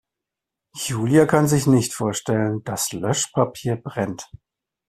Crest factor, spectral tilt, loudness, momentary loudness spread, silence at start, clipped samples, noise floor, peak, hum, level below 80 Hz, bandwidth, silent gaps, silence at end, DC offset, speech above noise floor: 20 dB; -5 dB/octave; -21 LUFS; 12 LU; 0.75 s; under 0.1%; -85 dBFS; -2 dBFS; none; -54 dBFS; 15 kHz; none; 0.5 s; under 0.1%; 65 dB